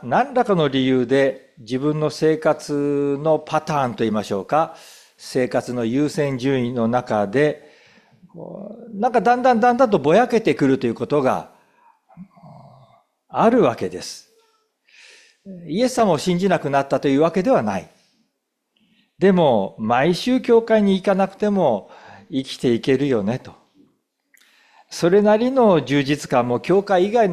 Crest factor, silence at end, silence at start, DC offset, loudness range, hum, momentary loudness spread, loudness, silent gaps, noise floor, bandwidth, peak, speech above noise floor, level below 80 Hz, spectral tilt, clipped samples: 16 dB; 0 s; 0 s; under 0.1%; 5 LU; none; 12 LU; -19 LUFS; none; -74 dBFS; 14 kHz; -4 dBFS; 56 dB; -58 dBFS; -6.5 dB/octave; under 0.1%